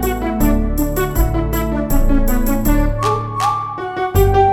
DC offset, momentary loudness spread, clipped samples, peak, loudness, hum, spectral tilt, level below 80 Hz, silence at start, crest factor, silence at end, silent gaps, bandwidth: under 0.1%; 4 LU; under 0.1%; -2 dBFS; -17 LUFS; none; -6.5 dB/octave; -18 dBFS; 0 s; 14 dB; 0 s; none; 17.5 kHz